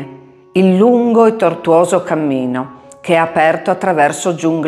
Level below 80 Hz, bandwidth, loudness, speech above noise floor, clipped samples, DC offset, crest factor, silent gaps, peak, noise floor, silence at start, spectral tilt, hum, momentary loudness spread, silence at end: -62 dBFS; 13.5 kHz; -13 LUFS; 24 dB; under 0.1%; under 0.1%; 14 dB; none; 0 dBFS; -37 dBFS; 0 s; -6 dB/octave; none; 10 LU; 0 s